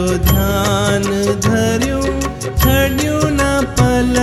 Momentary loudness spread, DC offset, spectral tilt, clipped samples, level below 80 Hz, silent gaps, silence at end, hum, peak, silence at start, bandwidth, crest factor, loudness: 4 LU; under 0.1%; -5 dB/octave; under 0.1%; -22 dBFS; none; 0 s; none; 0 dBFS; 0 s; 15.5 kHz; 14 dB; -15 LUFS